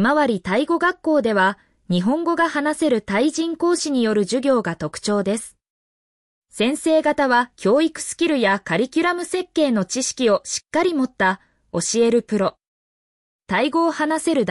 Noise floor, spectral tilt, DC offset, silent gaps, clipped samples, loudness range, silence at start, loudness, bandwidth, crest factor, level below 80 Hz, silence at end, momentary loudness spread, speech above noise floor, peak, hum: under -90 dBFS; -4 dB/octave; under 0.1%; 5.70-6.42 s, 12.68-13.39 s; under 0.1%; 3 LU; 0 s; -20 LUFS; 12 kHz; 14 dB; -60 dBFS; 0 s; 6 LU; over 71 dB; -6 dBFS; none